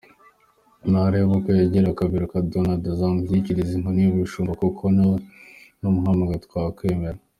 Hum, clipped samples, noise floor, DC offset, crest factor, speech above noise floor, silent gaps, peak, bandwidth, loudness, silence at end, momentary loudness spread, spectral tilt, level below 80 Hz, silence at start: none; under 0.1%; -60 dBFS; under 0.1%; 14 dB; 39 dB; none; -8 dBFS; 8.8 kHz; -22 LUFS; 0.25 s; 7 LU; -9.5 dB/octave; -46 dBFS; 0.85 s